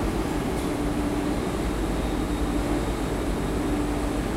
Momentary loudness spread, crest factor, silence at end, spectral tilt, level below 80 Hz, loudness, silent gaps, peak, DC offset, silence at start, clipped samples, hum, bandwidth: 1 LU; 12 dB; 0 s; -6 dB/octave; -32 dBFS; -27 LUFS; none; -12 dBFS; under 0.1%; 0 s; under 0.1%; none; 16 kHz